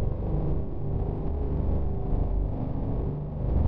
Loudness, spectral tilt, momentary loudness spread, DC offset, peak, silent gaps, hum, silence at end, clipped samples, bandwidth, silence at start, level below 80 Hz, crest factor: -31 LUFS; -13 dB/octave; 3 LU; under 0.1%; -14 dBFS; none; none; 0 s; under 0.1%; 3.6 kHz; 0 s; -30 dBFS; 12 dB